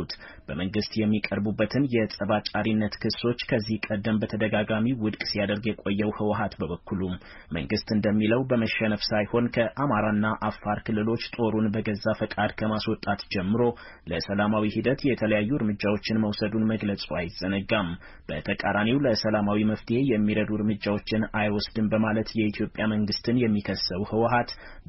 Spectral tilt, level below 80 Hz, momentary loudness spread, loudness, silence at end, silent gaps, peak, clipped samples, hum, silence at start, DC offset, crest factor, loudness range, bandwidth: -5 dB/octave; -48 dBFS; 6 LU; -26 LUFS; 0.05 s; none; -12 dBFS; under 0.1%; none; 0 s; under 0.1%; 14 dB; 2 LU; 6 kHz